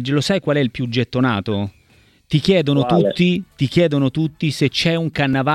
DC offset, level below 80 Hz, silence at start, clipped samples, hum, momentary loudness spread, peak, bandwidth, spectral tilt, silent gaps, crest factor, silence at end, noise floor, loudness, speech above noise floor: under 0.1%; -48 dBFS; 0 s; under 0.1%; none; 6 LU; -2 dBFS; 13.5 kHz; -6.5 dB/octave; none; 16 dB; 0 s; -53 dBFS; -18 LUFS; 36 dB